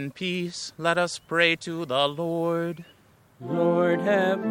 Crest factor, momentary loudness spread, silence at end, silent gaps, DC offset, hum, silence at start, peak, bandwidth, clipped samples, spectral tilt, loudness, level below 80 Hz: 18 dB; 10 LU; 0 s; none; under 0.1%; none; 0 s; -6 dBFS; 16.5 kHz; under 0.1%; -5 dB/octave; -25 LUFS; -70 dBFS